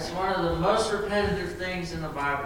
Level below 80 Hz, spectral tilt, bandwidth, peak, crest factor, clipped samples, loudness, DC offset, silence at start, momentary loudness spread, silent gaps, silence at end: -42 dBFS; -5 dB/octave; 17 kHz; -12 dBFS; 16 dB; under 0.1%; -27 LUFS; under 0.1%; 0 s; 7 LU; none; 0 s